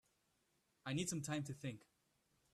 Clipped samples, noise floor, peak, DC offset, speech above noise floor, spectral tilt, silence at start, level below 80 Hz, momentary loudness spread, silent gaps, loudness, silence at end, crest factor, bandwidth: under 0.1%; -82 dBFS; -30 dBFS; under 0.1%; 38 dB; -4.5 dB/octave; 0.85 s; -78 dBFS; 11 LU; none; -45 LUFS; 0.75 s; 18 dB; 14 kHz